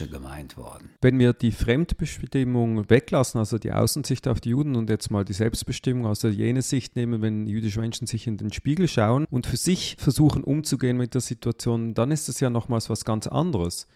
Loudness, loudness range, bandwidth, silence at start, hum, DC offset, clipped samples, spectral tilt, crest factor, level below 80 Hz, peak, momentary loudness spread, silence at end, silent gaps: -24 LUFS; 3 LU; 15 kHz; 0 s; none; under 0.1%; under 0.1%; -6 dB/octave; 20 dB; -42 dBFS; -4 dBFS; 8 LU; 0.15 s; none